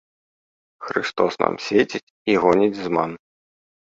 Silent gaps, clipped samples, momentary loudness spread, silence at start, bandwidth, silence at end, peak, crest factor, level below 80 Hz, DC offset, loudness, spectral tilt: 2.03-2.25 s; under 0.1%; 11 LU; 0.8 s; 7.8 kHz; 0.8 s; 0 dBFS; 22 dB; -60 dBFS; under 0.1%; -21 LUFS; -5.5 dB/octave